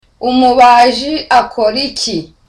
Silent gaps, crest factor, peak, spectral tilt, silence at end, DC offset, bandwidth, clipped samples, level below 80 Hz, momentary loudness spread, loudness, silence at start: none; 10 dB; 0 dBFS; -3 dB/octave; 0.25 s; under 0.1%; 11.5 kHz; under 0.1%; -42 dBFS; 11 LU; -10 LUFS; 0.2 s